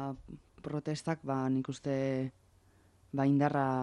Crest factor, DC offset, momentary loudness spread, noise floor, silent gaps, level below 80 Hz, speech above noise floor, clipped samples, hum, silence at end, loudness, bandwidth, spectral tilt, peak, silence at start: 16 dB; under 0.1%; 14 LU; -65 dBFS; none; -66 dBFS; 32 dB; under 0.1%; none; 0 s; -34 LUFS; 11 kHz; -7.5 dB/octave; -18 dBFS; 0 s